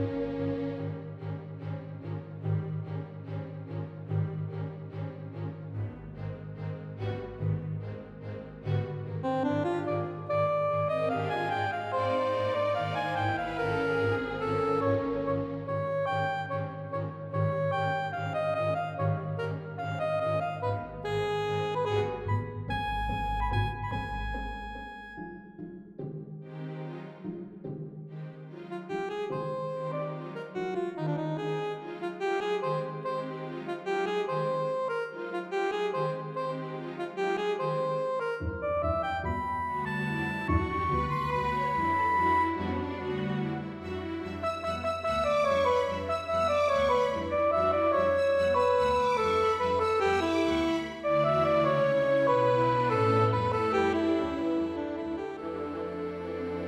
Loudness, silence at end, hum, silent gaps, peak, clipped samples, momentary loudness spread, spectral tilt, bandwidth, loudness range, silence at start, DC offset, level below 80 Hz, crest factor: -30 LUFS; 0 s; none; none; -14 dBFS; under 0.1%; 14 LU; -7 dB/octave; 12.5 kHz; 11 LU; 0 s; under 0.1%; -50 dBFS; 16 dB